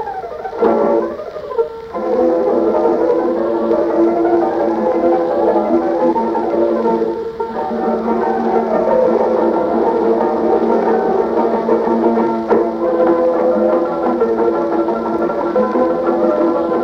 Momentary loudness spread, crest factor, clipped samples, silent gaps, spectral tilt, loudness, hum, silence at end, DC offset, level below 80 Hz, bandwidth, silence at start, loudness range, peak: 5 LU; 12 dB; under 0.1%; none; -8 dB/octave; -15 LUFS; none; 0 s; under 0.1%; -48 dBFS; 6.4 kHz; 0 s; 2 LU; -2 dBFS